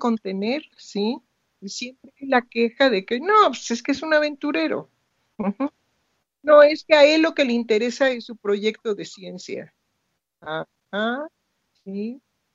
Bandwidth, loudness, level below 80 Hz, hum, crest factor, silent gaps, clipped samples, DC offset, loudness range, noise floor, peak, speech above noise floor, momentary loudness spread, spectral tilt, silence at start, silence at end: 7.8 kHz; -21 LUFS; -70 dBFS; none; 22 dB; none; under 0.1%; under 0.1%; 11 LU; -76 dBFS; 0 dBFS; 55 dB; 19 LU; -4 dB/octave; 0 s; 0.4 s